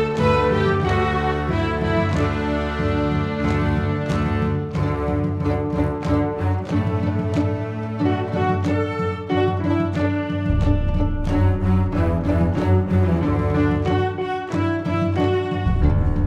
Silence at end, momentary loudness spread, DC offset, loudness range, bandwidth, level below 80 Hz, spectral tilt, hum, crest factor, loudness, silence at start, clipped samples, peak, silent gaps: 0 s; 4 LU; under 0.1%; 2 LU; 8.2 kHz; -30 dBFS; -8.5 dB/octave; none; 14 dB; -21 LUFS; 0 s; under 0.1%; -6 dBFS; none